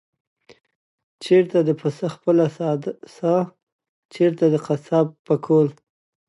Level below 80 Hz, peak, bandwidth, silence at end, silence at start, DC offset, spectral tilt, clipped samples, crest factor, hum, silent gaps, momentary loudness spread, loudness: -72 dBFS; -4 dBFS; 11.5 kHz; 0.55 s; 1.2 s; under 0.1%; -8 dB/octave; under 0.1%; 16 dB; none; 3.63-3.79 s, 3.89-4.09 s, 5.19-5.25 s; 8 LU; -21 LUFS